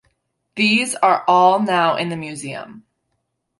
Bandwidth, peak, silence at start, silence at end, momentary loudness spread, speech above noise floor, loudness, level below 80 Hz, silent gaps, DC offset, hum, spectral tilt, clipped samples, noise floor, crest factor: 12 kHz; -2 dBFS; 0.55 s; 0.8 s; 16 LU; 56 dB; -16 LUFS; -68 dBFS; none; under 0.1%; none; -4 dB/octave; under 0.1%; -73 dBFS; 16 dB